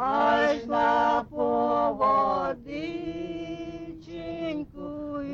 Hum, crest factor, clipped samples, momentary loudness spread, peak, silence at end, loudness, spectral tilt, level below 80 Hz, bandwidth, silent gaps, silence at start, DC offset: none; 14 dB; under 0.1%; 14 LU; -12 dBFS; 0 s; -26 LUFS; -6 dB/octave; -54 dBFS; 7.6 kHz; none; 0 s; under 0.1%